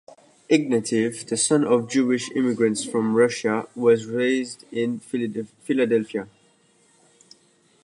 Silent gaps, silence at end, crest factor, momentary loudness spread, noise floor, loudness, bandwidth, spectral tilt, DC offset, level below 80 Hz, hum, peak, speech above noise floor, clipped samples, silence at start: none; 1.6 s; 18 dB; 8 LU; -60 dBFS; -23 LUFS; 11.5 kHz; -4.5 dB/octave; under 0.1%; -72 dBFS; none; -6 dBFS; 38 dB; under 0.1%; 0.5 s